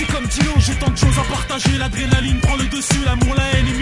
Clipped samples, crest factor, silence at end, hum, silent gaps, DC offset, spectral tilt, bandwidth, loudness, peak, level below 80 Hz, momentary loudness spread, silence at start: under 0.1%; 16 dB; 0 s; none; none; under 0.1%; -4.5 dB/octave; 11.5 kHz; -17 LUFS; 0 dBFS; -22 dBFS; 3 LU; 0 s